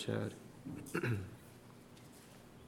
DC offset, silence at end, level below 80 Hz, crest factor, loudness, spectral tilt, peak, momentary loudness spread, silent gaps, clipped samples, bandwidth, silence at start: under 0.1%; 0 s; -70 dBFS; 20 dB; -42 LUFS; -6 dB/octave; -24 dBFS; 19 LU; none; under 0.1%; 17 kHz; 0 s